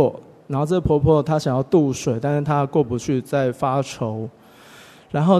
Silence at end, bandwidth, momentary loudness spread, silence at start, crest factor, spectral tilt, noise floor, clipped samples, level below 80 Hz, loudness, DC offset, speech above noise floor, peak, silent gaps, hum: 0 s; 13.5 kHz; 10 LU; 0 s; 16 dB; -7.5 dB/octave; -46 dBFS; under 0.1%; -44 dBFS; -21 LUFS; under 0.1%; 26 dB; -4 dBFS; none; none